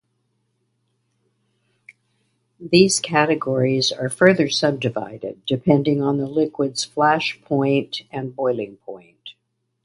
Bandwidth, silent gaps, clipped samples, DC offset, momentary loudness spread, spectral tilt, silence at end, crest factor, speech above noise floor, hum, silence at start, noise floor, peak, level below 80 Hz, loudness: 11.5 kHz; none; under 0.1%; under 0.1%; 15 LU; -4.5 dB/octave; 0.55 s; 22 dB; 54 dB; none; 2.6 s; -73 dBFS; 0 dBFS; -62 dBFS; -20 LUFS